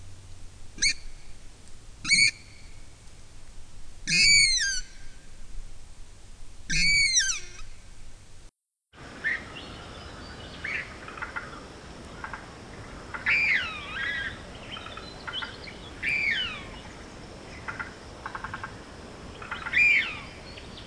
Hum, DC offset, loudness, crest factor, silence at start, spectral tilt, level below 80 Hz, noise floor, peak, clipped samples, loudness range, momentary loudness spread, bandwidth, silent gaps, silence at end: none; under 0.1%; -24 LUFS; 24 dB; 0 s; 0 dB/octave; -44 dBFS; -61 dBFS; -8 dBFS; under 0.1%; 13 LU; 24 LU; 11 kHz; none; 0 s